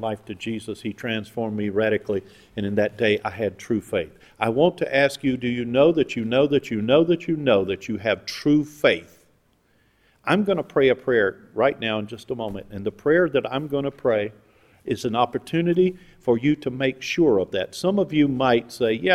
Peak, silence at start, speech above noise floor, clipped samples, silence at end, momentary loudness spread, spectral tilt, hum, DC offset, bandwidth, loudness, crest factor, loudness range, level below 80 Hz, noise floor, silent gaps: -2 dBFS; 0 s; 40 dB; under 0.1%; 0 s; 11 LU; -6 dB/octave; none; under 0.1%; 14.5 kHz; -23 LUFS; 20 dB; 4 LU; -56 dBFS; -63 dBFS; none